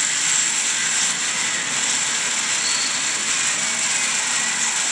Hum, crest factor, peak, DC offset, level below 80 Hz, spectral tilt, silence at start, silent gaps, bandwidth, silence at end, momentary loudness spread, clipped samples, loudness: none; 16 dB; -6 dBFS; under 0.1%; -76 dBFS; 1.5 dB/octave; 0 s; none; 10.5 kHz; 0 s; 3 LU; under 0.1%; -18 LUFS